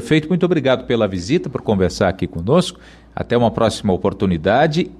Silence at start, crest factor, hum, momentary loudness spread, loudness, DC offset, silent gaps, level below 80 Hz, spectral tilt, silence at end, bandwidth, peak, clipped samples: 0 s; 14 dB; none; 5 LU; -18 LUFS; under 0.1%; none; -42 dBFS; -6.5 dB/octave; 0.05 s; 12.5 kHz; -4 dBFS; under 0.1%